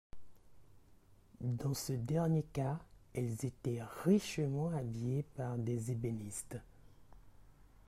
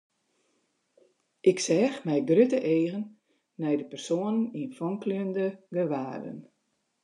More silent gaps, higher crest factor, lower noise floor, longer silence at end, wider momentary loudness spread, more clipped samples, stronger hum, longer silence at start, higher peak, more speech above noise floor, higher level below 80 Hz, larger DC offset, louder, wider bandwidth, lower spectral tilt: neither; about the same, 20 dB vs 20 dB; second, -64 dBFS vs -76 dBFS; second, 0.25 s vs 0.65 s; second, 11 LU vs 14 LU; neither; neither; second, 0.15 s vs 1.45 s; second, -18 dBFS vs -10 dBFS; second, 27 dB vs 49 dB; first, -62 dBFS vs -84 dBFS; neither; second, -38 LUFS vs -28 LUFS; first, 16 kHz vs 11 kHz; about the same, -6.5 dB/octave vs -6 dB/octave